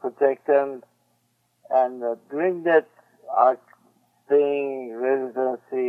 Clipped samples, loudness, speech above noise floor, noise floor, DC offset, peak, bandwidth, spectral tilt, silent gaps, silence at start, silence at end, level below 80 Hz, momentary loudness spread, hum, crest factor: under 0.1%; -23 LUFS; 47 dB; -69 dBFS; under 0.1%; -4 dBFS; 4 kHz; -7.5 dB/octave; none; 0.05 s; 0 s; -88 dBFS; 10 LU; none; 20 dB